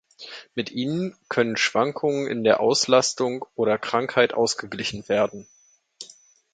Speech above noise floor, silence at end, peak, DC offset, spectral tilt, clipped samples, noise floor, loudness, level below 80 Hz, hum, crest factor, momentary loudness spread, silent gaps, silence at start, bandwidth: 29 dB; 0.5 s; -2 dBFS; under 0.1%; -3.5 dB/octave; under 0.1%; -52 dBFS; -23 LUFS; -64 dBFS; none; 22 dB; 20 LU; none; 0.2 s; 9.4 kHz